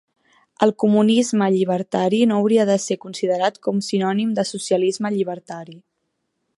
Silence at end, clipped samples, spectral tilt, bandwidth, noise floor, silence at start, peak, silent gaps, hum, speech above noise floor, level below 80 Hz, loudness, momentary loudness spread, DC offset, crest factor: 0.8 s; under 0.1%; -5.5 dB/octave; 11.5 kHz; -74 dBFS; 0.6 s; -2 dBFS; none; none; 55 dB; -70 dBFS; -19 LUFS; 8 LU; under 0.1%; 18 dB